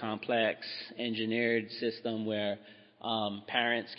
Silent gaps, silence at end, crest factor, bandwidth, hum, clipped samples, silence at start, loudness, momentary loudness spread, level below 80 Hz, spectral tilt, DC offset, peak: none; 0 s; 20 dB; 5.8 kHz; none; under 0.1%; 0 s; -33 LUFS; 8 LU; -84 dBFS; -8.5 dB/octave; under 0.1%; -12 dBFS